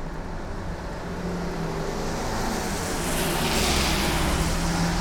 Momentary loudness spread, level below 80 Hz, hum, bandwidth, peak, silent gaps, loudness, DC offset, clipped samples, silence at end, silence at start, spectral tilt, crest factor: 12 LU; -32 dBFS; none; 19 kHz; -10 dBFS; none; -26 LUFS; under 0.1%; under 0.1%; 0 s; 0 s; -4 dB/octave; 16 dB